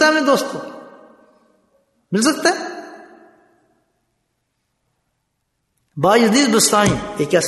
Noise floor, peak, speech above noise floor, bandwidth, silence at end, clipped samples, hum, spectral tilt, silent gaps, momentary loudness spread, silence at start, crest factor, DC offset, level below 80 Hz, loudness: -72 dBFS; -2 dBFS; 56 dB; 12.5 kHz; 0 s; under 0.1%; none; -3.5 dB/octave; none; 22 LU; 0 s; 18 dB; under 0.1%; -52 dBFS; -16 LUFS